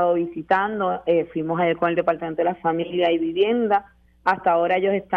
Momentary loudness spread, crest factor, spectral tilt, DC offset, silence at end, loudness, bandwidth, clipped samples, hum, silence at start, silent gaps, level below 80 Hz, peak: 5 LU; 18 dB; -8 dB/octave; under 0.1%; 0 s; -22 LUFS; 5.6 kHz; under 0.1%; none; 0 s; none; -58 dBFS; -4 dBFS